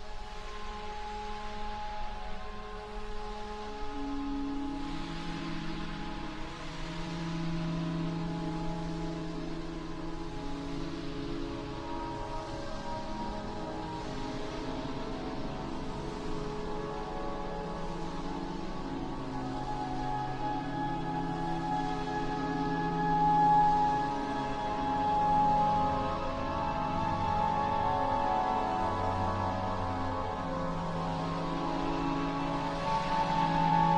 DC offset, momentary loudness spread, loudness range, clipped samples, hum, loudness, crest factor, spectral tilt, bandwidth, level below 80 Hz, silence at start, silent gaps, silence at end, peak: under 0.1%; 12 LU; 10 LU; under 0.1%; none; -34 LUFS; 18 dB; -6.5 dB/octave; 10 kHz; -44 dBFS; 0 s; none; 0 s; -16 dBFS